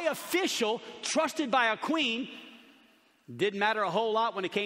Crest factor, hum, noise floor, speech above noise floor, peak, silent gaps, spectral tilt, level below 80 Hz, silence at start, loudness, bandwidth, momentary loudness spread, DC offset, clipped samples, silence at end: 18 dB; none; -63 dBFS; 34 dB; -12 dBFS; none; -3 dB/octave; -78 dBFS; 0 s; -29 LUFS; 16 kHz; 8 LU; under 0.1%; under 0.1%; 0 s